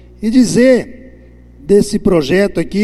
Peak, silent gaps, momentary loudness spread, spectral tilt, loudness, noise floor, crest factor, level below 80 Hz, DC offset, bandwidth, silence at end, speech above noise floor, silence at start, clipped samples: 0 dBFS; none; 6 LU; -6 dB/octave; -12 LUFS; -39 dBFS; 12 dB; -36 dBFS; under 0.1%; 13 kHz; 0 s; 28 dB; 0.2 s; under 0.1%